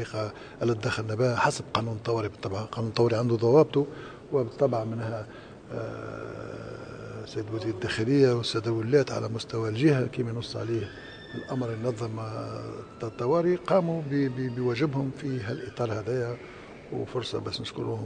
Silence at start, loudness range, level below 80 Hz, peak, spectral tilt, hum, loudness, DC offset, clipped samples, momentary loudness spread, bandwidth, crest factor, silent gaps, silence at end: 0 s; 6 LU; -58 dBFS; -6 dBFS; -6.5 dB/octave; none; -28 LUFS; under 0.1%; under 0.1%; 15 LU; 9.8 kHz; 22 dB; none; 0 s